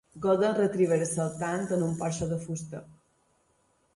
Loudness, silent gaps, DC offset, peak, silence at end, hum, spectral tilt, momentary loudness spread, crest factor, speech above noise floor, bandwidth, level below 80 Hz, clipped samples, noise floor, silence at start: -28 LUFS; none; under 0.1%; -12 dBFS; 1.05 s; none; -6 dB/octave; 12 LU; 16 dB; 42 dB; 11.5 kHz; -60 dBFS; under 0.1%; -70 dBFS; 0.15 s